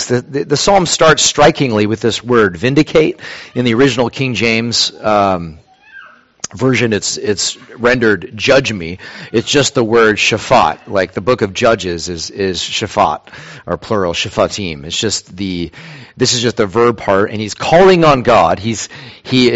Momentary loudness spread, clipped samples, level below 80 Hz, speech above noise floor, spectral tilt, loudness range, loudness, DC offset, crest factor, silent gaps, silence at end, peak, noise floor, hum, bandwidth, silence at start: 13 LU; under 0.1%; -40 dBFS; 26 dB; -4 dB/octave; 5 LU; -13 LUFS; under 0.1%; 14 dB; none; 0 s; 0 dBFS; -39 dBFS; none; 8.2 kHz; 0 s